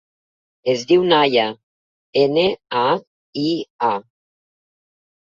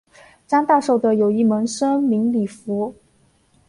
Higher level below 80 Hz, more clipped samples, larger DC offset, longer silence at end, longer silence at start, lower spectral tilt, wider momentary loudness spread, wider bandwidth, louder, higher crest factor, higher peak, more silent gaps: about the same, -62 dBFS vs -64 dBFS; neither; neither; first, 1.2 s vs 0.75 s; first, 0.65 s vs 0.5 s; about the same, -5.5 dB/octave vs -6 dB/octave; about the same, 10 LU vs 9 LU; second, 7.4 kHz vs 11 kHz; about the same, -19 LUFS vs -19 LUFS; about the same, 18 dB vs 16 dB; about the same, -2 dBFS vs -4 dBFS; first, 1.63-2.13 s, 3.07-3.33 s, 3.70-3.79 s vs none